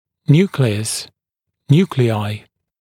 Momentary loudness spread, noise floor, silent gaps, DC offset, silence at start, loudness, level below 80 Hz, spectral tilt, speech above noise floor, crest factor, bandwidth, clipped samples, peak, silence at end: 12 LU; -80 dBFS; none; under 0.1%; 0.3 s; -17 LUFS; -58 dBFS; -6 dB/octave; 64 dB; 18 dB; 15.5 kHz; under 0.1%; 0 dBFS; 0.45 s